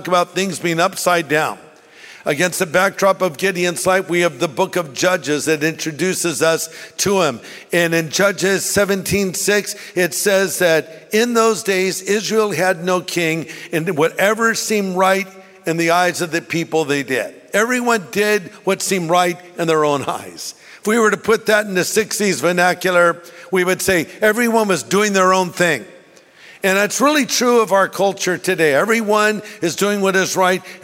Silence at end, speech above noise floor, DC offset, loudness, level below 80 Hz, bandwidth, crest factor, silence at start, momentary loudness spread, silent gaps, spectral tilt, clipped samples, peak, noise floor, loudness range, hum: 0.05 s; 28 dB; under 0.1%; -17 LUFS; -56 dBFS; 16.5 kHz; 16 dB; 0 s; 7 LU; none; -3.5 dB/octave; under 0.1%; -2 dBFS; -45 dBFS; 2 LU; none